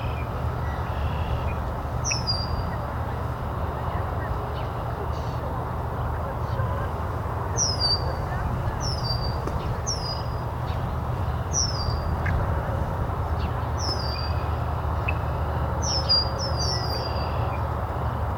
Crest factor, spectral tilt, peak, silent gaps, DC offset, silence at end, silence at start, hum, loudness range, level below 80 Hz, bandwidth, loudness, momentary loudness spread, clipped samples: 16 dB; -4.5 dB/octave; -10 dBFS; none; under 0.1%; 0 s; 0 s; none; 4 LU; -34 dBFS; 17.5 kHz; -27 LUFS; 6 LU; under 0.1%